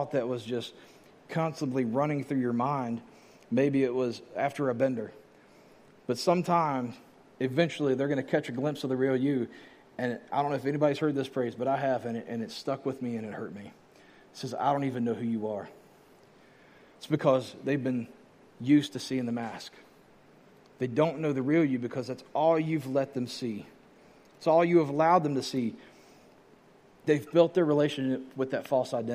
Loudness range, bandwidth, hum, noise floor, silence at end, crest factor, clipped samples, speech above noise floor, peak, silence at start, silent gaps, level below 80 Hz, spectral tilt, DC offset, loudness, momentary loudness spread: 5 LU; 15 kHz; none; -58 dBFS; 0 s; 20 dB; under 0.1%; 30 dB; -10 dBFS; 0 s; none; -74 dBFS; -6.5 dB/octave; under 0.1%; -29 LUFS; 13 LU